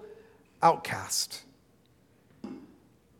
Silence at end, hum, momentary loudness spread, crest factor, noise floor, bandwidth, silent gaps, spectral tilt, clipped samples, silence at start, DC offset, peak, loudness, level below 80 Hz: 0.55 s; none; 23 LU; 26 dB; -64 dBFS; 18 kHz; none; -2.5 dB/octave; under 0.1%; 0 s; under 0.1%; -8 dBFS; -28 LUFS; -72 dBFS